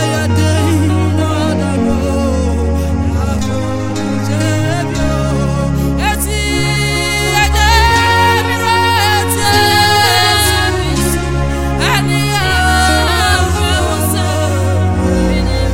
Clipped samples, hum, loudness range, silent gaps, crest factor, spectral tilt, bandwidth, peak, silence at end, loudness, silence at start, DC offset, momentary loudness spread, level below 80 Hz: under 0.1%; none; 5 LU; none; 12 dB; -4.5 dB/octave; 17 kHz; 0 dBFS; 0 s; -13 LUFS; 0 s; under 0.1%; 7 LU; -20 dBFS